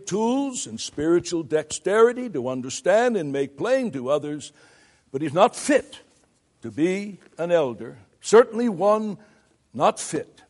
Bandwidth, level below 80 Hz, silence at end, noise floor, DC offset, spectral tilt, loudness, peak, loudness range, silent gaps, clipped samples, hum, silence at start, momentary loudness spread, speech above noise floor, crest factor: 11.5 kHz; -64 dBFS; 0.25 s; -63 dBFS; under 0.1%; -4.5 dB/octave; -23 LUFS; -2 dBFS; 3 LU; none; under 0.1%; none; 0 s; 17 LU; 40 dB; 20 dB